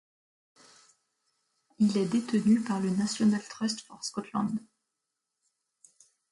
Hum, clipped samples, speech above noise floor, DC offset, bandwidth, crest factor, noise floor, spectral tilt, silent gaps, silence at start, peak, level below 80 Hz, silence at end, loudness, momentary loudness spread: none; under 0.1%; 57 dB; under 0.1%; 11.5 kHz; 16 dB; -85 dBFS; -5.5 dB/octave; none; 1.8 s; -14 dBFS; -74 dBFS; 1.7 s; -29 LUFS; 10 LU